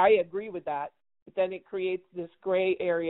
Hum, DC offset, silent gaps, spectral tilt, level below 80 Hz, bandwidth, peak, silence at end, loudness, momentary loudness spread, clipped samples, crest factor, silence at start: none; under 0.1%; 1.22-1.26 s; -3.5 dB/octave; -68 dBFS; 4.1 kHz; -10 dBFS; 0 s; -30 LUFS; 11 LU; under 0.1%; 18 dB; 0 s